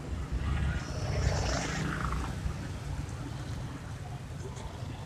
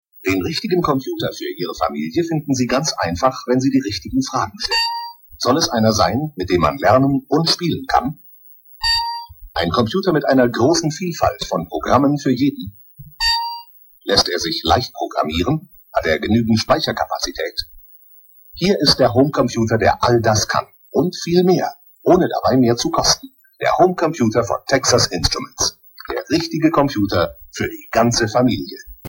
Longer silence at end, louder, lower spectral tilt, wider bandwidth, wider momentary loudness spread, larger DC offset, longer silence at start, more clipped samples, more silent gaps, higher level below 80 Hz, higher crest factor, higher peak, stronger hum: about the same, 0 s vs 0 s; second, -35 LUFS vs -18 LUFS; about the same, -5.5 dB/octave vs -4.5 dB/octave; second, 13.5 kHz vs 18 kHz; about the same, 10 LU vs 10 LU; neither; second, 0 s vs 0.2 s; neither; neither; about the same, -38 dBFS vs -40 dBFS; about the same, 20 dB vs 18 dB; second, -16 dBFS vs 0 dBFS; neither